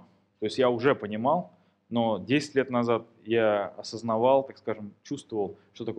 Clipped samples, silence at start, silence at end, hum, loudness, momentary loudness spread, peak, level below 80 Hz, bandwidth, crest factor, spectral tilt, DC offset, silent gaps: under 0.1%; 0.4 s; 0 s; none; -27 LUFS; 12 LU; -8 dBFS; -74 dBFS; 10 kHz; 20 dB; -6 dB/octave; under 0.1%; none